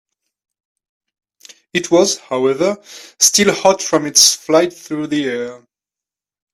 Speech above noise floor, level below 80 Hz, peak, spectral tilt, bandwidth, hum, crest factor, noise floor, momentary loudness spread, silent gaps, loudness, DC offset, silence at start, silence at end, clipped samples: 73 dB; -60 dBFS; 0 dBFS; -2 dB/octave; 16 kHz; none; 18 dB; -88 dBFS; 13 LU; none; -14 LUFS; under 0.1%; 1.75 s; 0.95 s; under 0.1%